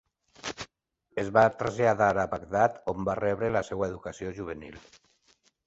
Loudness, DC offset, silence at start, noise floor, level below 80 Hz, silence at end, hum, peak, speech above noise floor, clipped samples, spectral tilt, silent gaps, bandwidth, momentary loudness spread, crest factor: -28 LUFS; under 0.1%; 0.45 s; -72 dBFS; -56 dBFS; 0.9 s; none; -6 dBFS; 45 dB; under 0.1%; -6 dB/octave; none; 8 kHz; 16 LU; 24 dB